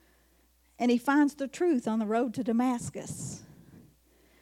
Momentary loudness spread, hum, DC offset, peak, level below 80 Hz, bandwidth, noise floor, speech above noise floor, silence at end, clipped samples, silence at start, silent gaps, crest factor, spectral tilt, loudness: 13 LU; none; under 0.1%; -14 dBFS; -68 dBFS; 15 kHz; -66 dBFS; 37 dB; 0.6 s; under 0.1%; 0.8 s; none; 16 dB; -5.5 dB/octave; -29 LUFS